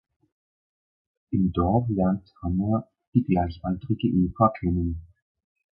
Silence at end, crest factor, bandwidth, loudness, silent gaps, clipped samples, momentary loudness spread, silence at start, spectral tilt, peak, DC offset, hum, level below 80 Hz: 0.75 s; 20 dB; 5.2 kHz; -25 LUFS; 3.07-3.12 s; under 0.1%; 8 LU; 1.3 s; -13 dB/octave; -6 dBFS; under 0.1%; none; -40 dBFS